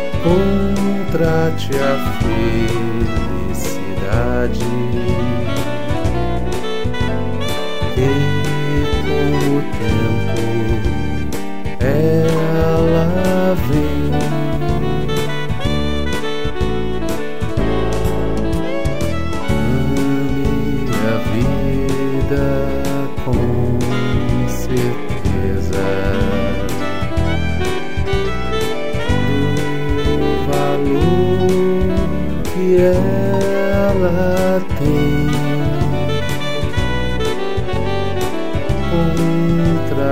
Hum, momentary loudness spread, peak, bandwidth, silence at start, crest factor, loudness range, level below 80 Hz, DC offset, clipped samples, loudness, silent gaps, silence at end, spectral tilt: none; 6 LU; -2 dBFS; 16 kHz; 0 s; 14 dB; 4 LU; -26 dBFS; 10%; under 0.1%; -18 LUFS; none; 0 s; -6.5 dB/octave